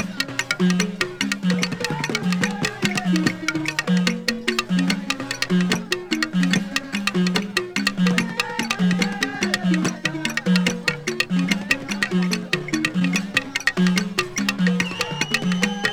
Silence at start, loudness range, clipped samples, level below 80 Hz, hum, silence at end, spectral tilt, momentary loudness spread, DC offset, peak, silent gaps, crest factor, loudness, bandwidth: 0 s; 1 LU; under 0.1%; -54 dBFS; none; 0 s; -4.5 dB/octave; 4 LU; under 0.1%; -2 dBFS; none; 20 dB; -22 LUFS; 19 kHz